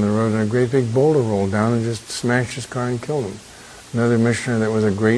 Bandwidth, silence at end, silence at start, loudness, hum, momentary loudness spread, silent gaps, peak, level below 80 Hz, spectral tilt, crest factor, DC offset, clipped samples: 11 kHz; 0 s; 0 s; -20 LUFS; none; 9 LU; none; -2 dBFS; -52 dBFS; -6.5 dB/octave; 16 dB; under 0.1%; under 0.1%